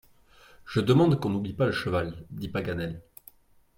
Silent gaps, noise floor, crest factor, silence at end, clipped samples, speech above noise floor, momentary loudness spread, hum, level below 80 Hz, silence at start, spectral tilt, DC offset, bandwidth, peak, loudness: none; -56 dBFS; 18 dB; 0.75 s; under 0.1%; 30 dB; 15 LU; none; -54 dBFS; 0.65 s; -7.5 dB/octave; under 0.1%; 16.5 kHz; -10 dBFS; -27 LUFS